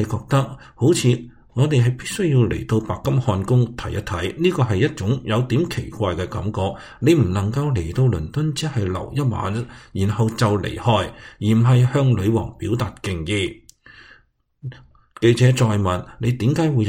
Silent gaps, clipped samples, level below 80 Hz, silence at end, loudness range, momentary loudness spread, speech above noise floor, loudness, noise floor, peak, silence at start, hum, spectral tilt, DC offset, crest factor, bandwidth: none; under 0.1%; -42 dBFS; 0 s; 3 LU; 9 LU; 38 dB; -20 LUFS; -57 dBFS; -2 dBFS; 0 s; none; -6.5 dB/octave; under 0.1%; 18 dB; 15.5 kHz